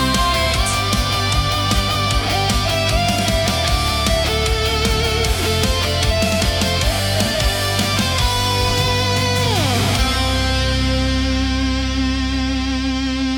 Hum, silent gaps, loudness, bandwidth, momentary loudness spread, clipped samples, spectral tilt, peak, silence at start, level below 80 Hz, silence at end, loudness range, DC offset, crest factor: none; none; -17 LUFS; 18 kHz; 3 LU; under 0.1%; -4 dB/octave; -2 dBFS; 0 s; -24 dBFS; 0 s; 1 LU; under 0.1%; 14 dB